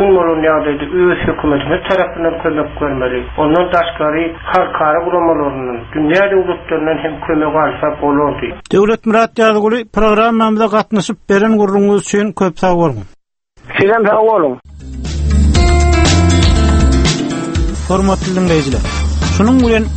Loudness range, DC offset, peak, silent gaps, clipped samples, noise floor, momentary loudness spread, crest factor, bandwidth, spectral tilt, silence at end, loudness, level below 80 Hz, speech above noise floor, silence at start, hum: 3 LU; under 0.1%; 0 dBFS; none; under 0.1%; -46 dBFS; 7 LU; 12 dB; 8.8 kHz; -6 dB/octave; 0 s; -13 LUFS; -20 dBFS; 34 dB; 0 s; none